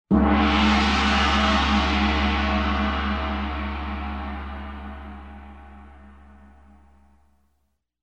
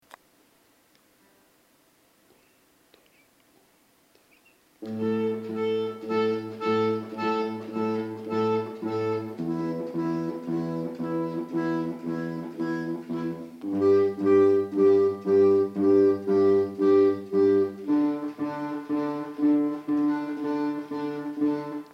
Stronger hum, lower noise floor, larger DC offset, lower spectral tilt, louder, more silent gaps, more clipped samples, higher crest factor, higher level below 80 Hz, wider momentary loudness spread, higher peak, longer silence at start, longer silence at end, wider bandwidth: neither; first, -72 dBFS vs -63 dBFS; first, 0.1% vs under 0.1%; second, -5.5 dB/octave vs -8 dB/octave; first, -22 LUFS vs -26 LUFS; neither; neither; about the same, 16 dB vs 16 dB; first, -30 dBFS vs -74 dBFS; first, 19 LU vs 11 LU; about the same, -8 dBFS vs -10 dBFS; second, 0.1 s vs 4.8 s; first, 1.9 s vs 0.05 s; first, 8.8 kHz vs 7.2 kHz